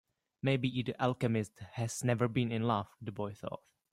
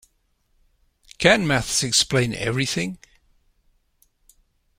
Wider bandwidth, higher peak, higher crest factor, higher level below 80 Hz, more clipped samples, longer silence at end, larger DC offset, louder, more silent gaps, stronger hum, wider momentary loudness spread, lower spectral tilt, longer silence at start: about the same, 15.5 kHz vs 16.5 kHz; second, -16 dBFS vs 0 dBFS; second, 18 dB vs 24 dB; second, -68 dBFS vs -48 dBFS; neither; second, 0.35 s vs 1.85 s; neither; second, -35 LUFS vs -20 LUFS; neither; neither; about the same, 12 LU vs 10 LU; first, -6 dB/octave vs -3 dB/octave; second, 0.45 s vs 1.2 s